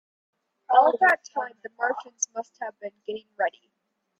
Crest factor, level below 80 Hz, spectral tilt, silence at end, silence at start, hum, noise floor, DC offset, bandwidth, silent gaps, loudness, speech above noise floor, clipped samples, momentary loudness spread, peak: 20 dB; -82 dBFS; -0.5 dB/octave; 0.7 s; 0.7 s; none; -78 dBFS; under 0.1%; 11.5 kHz; none; -24 LUFS; 53 dB; under 0.1%; 17 LU; -6 dBFS